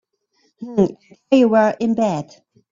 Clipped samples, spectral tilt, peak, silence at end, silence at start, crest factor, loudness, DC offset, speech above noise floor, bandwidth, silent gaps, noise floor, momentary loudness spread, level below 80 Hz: under 0.1%; -7 dB/octave; 0 dBFS; 0.5 s; 0.6 s; 18 dB; -18 LUFS; under 0.1%; 47 dB; 7.6 kHz; none; -65 dBFS; 15 LU; -58 dBFS